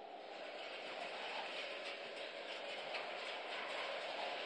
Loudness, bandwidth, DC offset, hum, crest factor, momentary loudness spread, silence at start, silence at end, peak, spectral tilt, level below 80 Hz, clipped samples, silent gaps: -45 LUFS; 10.5 kHz; under 0.1%; none; 16 dB; 5 LU; 0 s; 0 s; -30 dBFS; -1.5 dB/octave; under -90 dBFS; under 0.1%; none